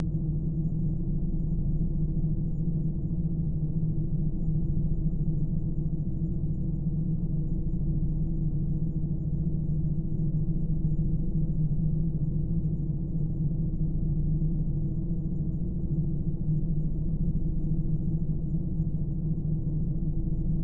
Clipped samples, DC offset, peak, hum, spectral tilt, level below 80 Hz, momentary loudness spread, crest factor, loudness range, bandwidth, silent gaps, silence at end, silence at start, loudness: under 0.1%; 0.4%; -16 dBFS; none; -15.5 dB/octave; -32 dBFS; 2 LU; 12 dB; 1 LU; 1.1 kHz; none; 0 s; 0 s; -30 LUFS